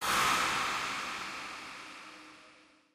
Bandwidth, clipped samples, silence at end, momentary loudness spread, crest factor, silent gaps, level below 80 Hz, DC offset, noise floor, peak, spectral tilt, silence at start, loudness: 15.5 kHz; under 0.1%; 0.4 s; 22 LU; 18 dB; none; -64 dBFS; under 0.1%; -61 dBFS; -16 dBFS; -1 dB/octave; 0 s; -32 LUFS